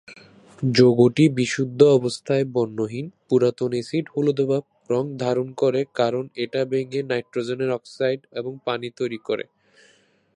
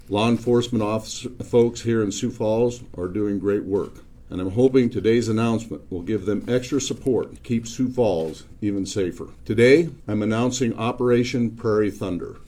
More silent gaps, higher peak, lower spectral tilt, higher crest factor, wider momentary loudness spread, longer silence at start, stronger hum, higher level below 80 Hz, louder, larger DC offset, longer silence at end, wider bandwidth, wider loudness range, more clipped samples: neither; about the same, -2 dBFS vs -2 dBFS; about the same, -6.5 dB/octave vs -6 dB/octave; about the same, 20 dB vs 20 dB; about the same, 12 LU vs 10 LU; about the same, 0.1 s vs 0.05 s; neither; second, -66 dBFS vs -46 dBFS; about the same, -22 LUFS vs -22 LUFS; neither; first, 0.95 s vs 0 s; second, 10.5 kHz vs 14.5 kHz; first, 7 LU vs 3 LU; neither